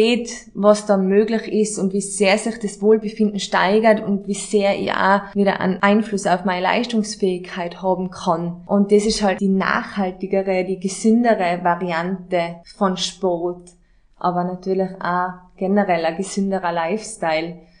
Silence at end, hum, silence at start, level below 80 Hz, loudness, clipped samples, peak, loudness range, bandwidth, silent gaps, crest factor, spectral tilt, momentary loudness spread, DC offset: 0.2 s; none; 0 s; -52 dBFS; -19 LUFS; under 0.1%; -2 dBFS; 4 LU; 10.5 kHz; none; 18 dB; -5 dB/octave; 8 LU; under 0.1%